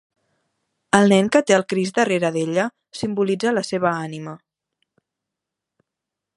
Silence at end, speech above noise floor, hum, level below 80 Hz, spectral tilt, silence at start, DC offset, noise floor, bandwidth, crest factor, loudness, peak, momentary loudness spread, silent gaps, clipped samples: 2 s; 65 dB; none; -64 dBFS; -5 dB/octave; 0.95 s; under 0.1%; -84 dBFS; 11.5 kHz; 22 dB; -19 LUFS; 0 dBFS; 13 LU; none; under 0.1%